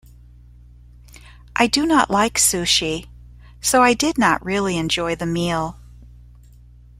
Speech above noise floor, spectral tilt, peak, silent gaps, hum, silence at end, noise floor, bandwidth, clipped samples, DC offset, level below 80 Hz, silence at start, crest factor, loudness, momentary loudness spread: 27 dB; -3 dB/octave; -2 dBFS; none; 60 Hz at -40 dBFS; 0.95 s; -45 dBFS; 16 kHz; under 0.1%; under 0.1%; -44 dBFS; 1.55 s; 18 dB; -18 LUFS; 10 LU